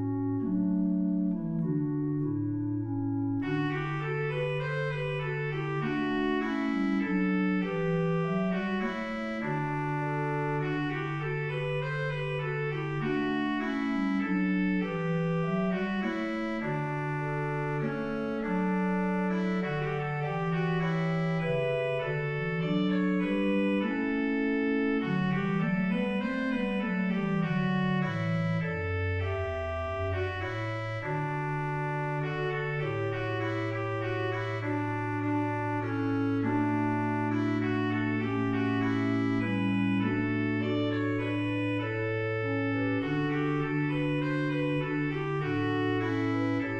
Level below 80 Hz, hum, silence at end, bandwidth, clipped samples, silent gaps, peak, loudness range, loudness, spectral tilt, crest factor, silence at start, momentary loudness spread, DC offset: -54 dBFS; none; 0 s; 8.2 kHz; under 0.1%; none; -18 dBFS; 3 LU; -30 LUFS; -8.5 dB/octave; 12 dB; 0 s; 4 LU; under 0.1%